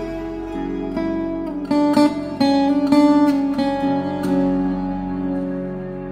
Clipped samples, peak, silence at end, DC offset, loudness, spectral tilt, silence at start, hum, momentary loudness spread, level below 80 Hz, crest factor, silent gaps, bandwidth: under 0.1%; -2 dBFS; 0 s; under 0.1%; -20 LUFS; -7 dB/octave; 0 s; none; 12 LU; -42 dBFS; 16 dB; none; 10.5 kHz